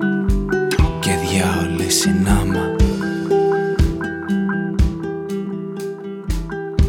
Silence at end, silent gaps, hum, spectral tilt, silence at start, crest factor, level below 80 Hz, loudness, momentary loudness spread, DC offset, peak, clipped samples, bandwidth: 0 s; none; none; -5 dB/octave; 0 s; 18 dB; -24 dBFS; -19 LUFS; 10 LU; under 0.1%; 0 dBFS; under 0.1%; 17 kHz